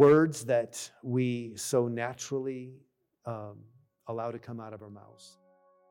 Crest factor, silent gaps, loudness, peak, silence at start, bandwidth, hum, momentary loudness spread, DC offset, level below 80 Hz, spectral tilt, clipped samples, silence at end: 18 dB; none; -32 LUFS; -12 dBFS; 0 s; 16.5 kHz; none; 19 LU; under 0.1%; -76 dBFS; -6 dB/octave; under 0.1%; 0.6 s